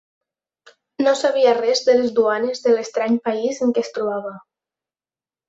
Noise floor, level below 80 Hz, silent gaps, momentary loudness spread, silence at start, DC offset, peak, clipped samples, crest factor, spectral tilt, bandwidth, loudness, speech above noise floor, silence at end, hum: under -90 dBFS; -68 dBFS; none; 8 LU; 1 s; under 0.1%; -4 dBFS; under 0.1%; 18 dB; -3.5 dB/octave; 8 kHz; -19 LUFS; over 72 dB; 1.1 s; none